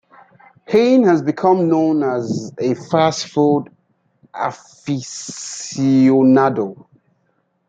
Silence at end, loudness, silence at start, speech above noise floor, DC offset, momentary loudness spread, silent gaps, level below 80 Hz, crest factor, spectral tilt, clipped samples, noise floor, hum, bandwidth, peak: 0.95 s; -17 LUFS; 0.7 s; 49 dB; under 0.1%; 15 LU; none; -64 dBFS; 16 dB; -6 dB/octave; under 0.1%; -65 dBFS; none; 9.2 kHz; -2 dBFS